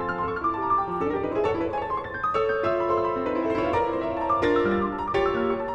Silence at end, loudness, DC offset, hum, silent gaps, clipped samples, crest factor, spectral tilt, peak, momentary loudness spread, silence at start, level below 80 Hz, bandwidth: 0 s; -25 LUFS; under 0.1%; none; none; under 0.1%; 14 dB; -7 dB/octave; -10 dBFS; 5 LU; 0 s; -48 dBFS; 8.2 kHz